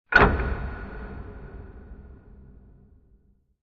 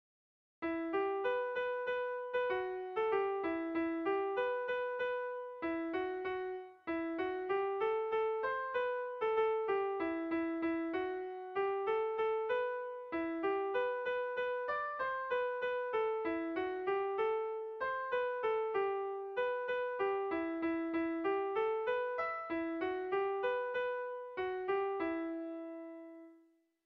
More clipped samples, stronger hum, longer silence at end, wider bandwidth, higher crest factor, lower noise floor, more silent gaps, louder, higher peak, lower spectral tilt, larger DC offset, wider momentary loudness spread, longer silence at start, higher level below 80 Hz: neither; neither; first, 1.2 s vs 0.5 s; first, 6.8 kHz vs 5.8 kHz; first, 26 dB vs 14 dB; second, -61 dBFS vs -69 dBFS; neither; first, -24 LUFS vs -37 LUFS; first, -2 dBFS vs -24 dBFS; first, -4 dB/octave vs -2 dB/octave; neither; first, 28 LU vs 6 LU; second, 0.1 s vs 0.6 s; first, -36 dBFS vs -74 dBFS